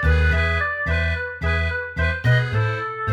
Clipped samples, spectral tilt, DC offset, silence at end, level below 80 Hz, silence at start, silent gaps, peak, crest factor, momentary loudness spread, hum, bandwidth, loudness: under 0.1%; -7 dB/octave; under 0.1%; 0 s; -26 dBFS; 0 s; none; -6 dBFS; 14 dB; 6 LU; none; 8.4 kHz; -21 LUFS